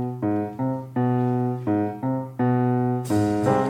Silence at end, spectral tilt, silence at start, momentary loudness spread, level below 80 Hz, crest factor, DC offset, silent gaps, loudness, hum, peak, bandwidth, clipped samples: 0 s; -8.5 dB/octave; 0 s; 6 LU; -58 dBFS; 16 dB; under 0.1%; none; -24 LUFS; none; -6 dBFS; 15 kHz; under 0.1%